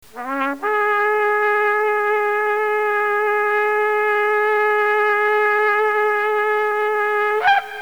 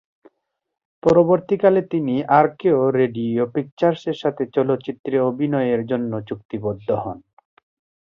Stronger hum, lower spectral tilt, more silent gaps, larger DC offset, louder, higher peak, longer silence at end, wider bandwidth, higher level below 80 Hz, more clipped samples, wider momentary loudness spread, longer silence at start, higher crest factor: neither; second, -2.5 dB/octave vs -8.5 dB/octave; second, none vs 3.72-3.77 s, 4.99-5.04 s, 6.45-6.49 s; first, 0.4% vs under 0.1%; about the same, -18 LUFS vs -20 LUFS; second, -6 dBFS vs -2 dBFS; second, 0 s vs 0.9 s; first, over 20 kHz vs 7.4 kHz; second, -66 dBFS vs -58 dBFS; neither; second, 3 LU vs 10 LU; second, 0.15 s vs 1.05 s; second, 12 dB vs 18 dB